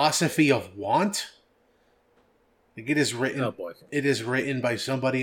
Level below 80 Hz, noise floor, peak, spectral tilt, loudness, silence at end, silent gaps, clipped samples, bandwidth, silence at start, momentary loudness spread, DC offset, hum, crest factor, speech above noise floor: -72 dBFS; -65 dBFS; -8 dBFS; -4.5 dB/octave; -26 LUFS; 0 s; none; under 0.1%; 18 kHz; 0 s; 9 LU; under 0.1%; none; 20 dB; 40 dB